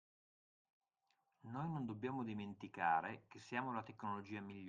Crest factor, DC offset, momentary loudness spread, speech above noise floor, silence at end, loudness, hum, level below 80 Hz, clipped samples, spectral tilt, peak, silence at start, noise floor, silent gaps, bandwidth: 22 dB; under 0.1%; 12 LU; 41 dB; 0 s; -44 LUFS; none; -84 dBFS; under 0.1%; -7 dB/octave; -24 dBFS; 1.45 s; -85 dBFS; none; 9 kHz